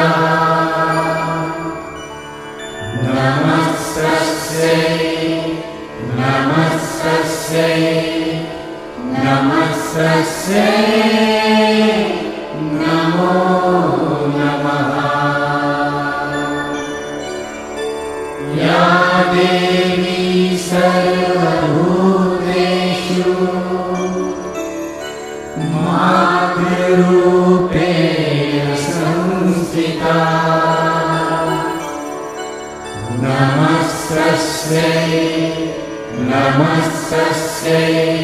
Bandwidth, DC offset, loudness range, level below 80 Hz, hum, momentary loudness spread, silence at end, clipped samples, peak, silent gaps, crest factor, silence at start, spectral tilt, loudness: 15.5 kHz; under 0.1%; 4 LU; -46 dBFS; none; 12 LU; 0 s; under 0.1%; 0 dBFS; none; 14 dB; 0 s; -5.5 dB/octave; -15 LUFS